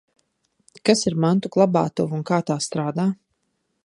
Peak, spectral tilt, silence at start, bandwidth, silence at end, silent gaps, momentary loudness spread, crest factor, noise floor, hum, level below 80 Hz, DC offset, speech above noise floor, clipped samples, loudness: -2 dBFS; -5.5 dB/octave; 0.85 s; 11.5 kHz; 0.7 s; none; 6 LU; 22 dB; -73 dBFS; none; -62 dBFS; under 0.1%; 53 dB; under 0.1%; -21 LUFS